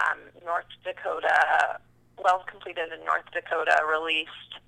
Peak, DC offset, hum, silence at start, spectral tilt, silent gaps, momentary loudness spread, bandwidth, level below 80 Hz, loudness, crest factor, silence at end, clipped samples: -6 dBFS; under 0.1%; 60 Hz at -65 dBFS; 0 s; -1.5 dB/octave; none; 12 LU; 11 kHz; -66 dBFS; -26 LUFS; 22 dB; 0.1 s; under 0.1%